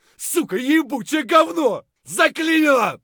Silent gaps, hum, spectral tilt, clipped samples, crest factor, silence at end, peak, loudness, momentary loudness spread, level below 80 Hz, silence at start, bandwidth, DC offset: none; none; -3 dB/octave; under 0.1%; 18 dB; 0.1 s; -2 dBFS; -18 LUFS; 8 LU; -72 dBFS; 0.2 s; 19.5 kHz; under 0.1%